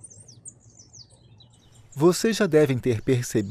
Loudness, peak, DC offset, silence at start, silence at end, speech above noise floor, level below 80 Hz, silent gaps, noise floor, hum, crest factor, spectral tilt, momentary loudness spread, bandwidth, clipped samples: -22 LUFS; -8 dBFS; under 0.1%; 0.45 s; 0 s; 32 dB; -56 dBFS; none; -53 dBFS; none; 18 dB; -5.5 dB/octave; 24 LU; 15.5 kHz; under 0.1%